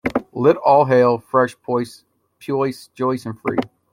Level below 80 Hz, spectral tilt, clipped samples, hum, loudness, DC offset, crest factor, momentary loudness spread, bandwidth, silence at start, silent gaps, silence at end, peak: -56 dBFS; -7 dB/octave; under 0.1%; none; -19 LUFS; under 0.1%; 16 dB; 11 LU; 15.5 kHz; 0.05 s; none; 0.25 s; -2 dBFS